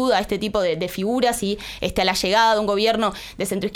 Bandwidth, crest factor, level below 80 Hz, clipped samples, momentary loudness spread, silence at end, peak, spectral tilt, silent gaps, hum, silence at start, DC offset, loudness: 19 kHz; 16 dB; -44 dBFS; under 0.1%; 9 LU; 0 s; -6 dBFS; -4 dB/octave; none; none; 0 s; under 0.1%; -21 LUFS